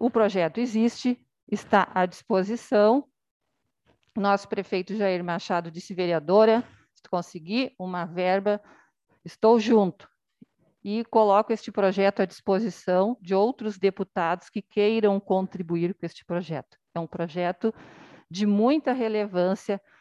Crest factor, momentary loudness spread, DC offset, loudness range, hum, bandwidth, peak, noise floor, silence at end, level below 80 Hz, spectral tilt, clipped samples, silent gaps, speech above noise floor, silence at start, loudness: 20 dB; 11 LU; under 0.1%; 4 LU; none; 11.5 kHz; -6 dBFS; -71 dBFS; 0.25 s; -70 dBFS; -6.5 dB/octave; under 0.1%; 1.43-1.47 s, 3.31-3.40 s; 47 dB; 0 s; -25 LUFS